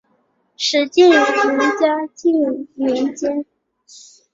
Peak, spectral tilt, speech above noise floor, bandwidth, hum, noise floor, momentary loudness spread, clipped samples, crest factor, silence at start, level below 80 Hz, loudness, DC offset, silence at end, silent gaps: -2 dBFS; -2.5 dB/octave; 47 dB; 7.8 kHz; none; -63 dBFS; 11 LU; under 0.1%; 16 dB; 0.6 s; -64 dBFS; -16 LUFS; under 0.1%; 0.9 s; none